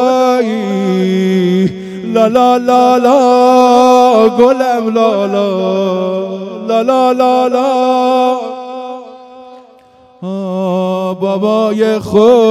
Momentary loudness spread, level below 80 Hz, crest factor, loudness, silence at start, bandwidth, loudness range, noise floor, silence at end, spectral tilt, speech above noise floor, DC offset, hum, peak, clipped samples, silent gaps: 13 LU; -56 dBFS; 10 dB; -11 LUFS; 0 s; 14 kHz; 8 LU; -43 dBFS; 0 s; -6.5 dB/octave; 33 dB; under 0.1%; none; 0 dBFS; 0.5%; none